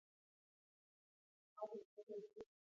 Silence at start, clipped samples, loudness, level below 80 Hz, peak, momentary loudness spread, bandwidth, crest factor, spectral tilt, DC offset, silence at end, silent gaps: 1.55 s; under 0.1%; -55 LUFS; under -90 dBFS; -36 dBFS; 9 LU; 7.2 kHz; 22 dB; -6 dB/octave; under 0.1%; 0.3 s; 1.85-1.97 s, 2.03-2.07 s